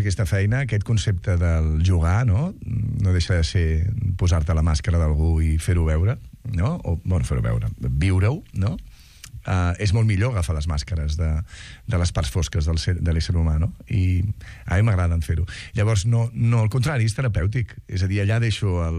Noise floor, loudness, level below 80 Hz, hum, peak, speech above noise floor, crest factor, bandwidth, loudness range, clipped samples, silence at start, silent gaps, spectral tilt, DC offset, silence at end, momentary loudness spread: -41 dBFS; -22 LUFS; -28 dBFS; none; -8 dBFS; 20 dB; 12 dB; 11.5 kHz; 3 LU; under 0.1%; 0 s; none; -6.5 dB/octave; under 0.1%; 0 s; 6 LU